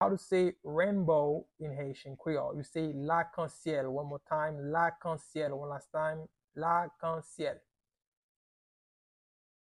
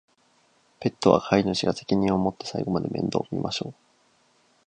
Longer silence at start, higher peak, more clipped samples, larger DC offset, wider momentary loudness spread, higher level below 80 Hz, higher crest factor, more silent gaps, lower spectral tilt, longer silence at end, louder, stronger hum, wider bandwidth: second, 0 s vs 0.8 s; second, -16 dBFS vs -2 dBFS; neither; neither; about the same, 11 LU vs 10 LU; second, -70 dBFS vs -54 dBFS; second, 18 dB vs 24 dB; first, 6.44-6.48 s vs none; about the same, -7 dB/octave vs -6 dB/octave; first, 2.15 s vs 0.95 s; second, -34 LUFS vs -25 LUFS; neither; first, 11.5 kHz vs 9.6 kHz